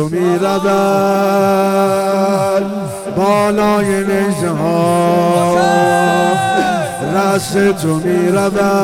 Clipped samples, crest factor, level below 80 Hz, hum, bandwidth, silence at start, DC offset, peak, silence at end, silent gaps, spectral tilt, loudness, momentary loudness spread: under 0.1%; 12 dB; -48 dBFS; none; 17.5 kHz; 0 s; under 0.1%; -2 dBFS; 0 s; none; -5.5 dB/octave; -13 LUFS; 4 LU